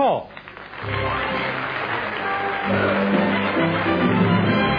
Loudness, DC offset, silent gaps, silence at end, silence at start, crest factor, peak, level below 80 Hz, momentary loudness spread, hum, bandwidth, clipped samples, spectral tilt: -21 LUFS; under 0.1%; none; 0 s; 0 s; 14 dB; -6 dBFS; -46 dBFS; 9 LU; none; 5.2 kHz; under 0.1%; -9 dB/octave